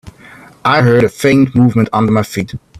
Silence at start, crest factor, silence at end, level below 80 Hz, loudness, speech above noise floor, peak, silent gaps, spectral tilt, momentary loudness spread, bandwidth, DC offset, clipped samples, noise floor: 0.05 s; 12 dB; 0 s; -44 dBFS; -12 LUFS; 28 dB; 0 dBFS; none; -7 dB/octave; 9 LU; 14 kHz; under 0.1%; under 0.1%; -39 dBFS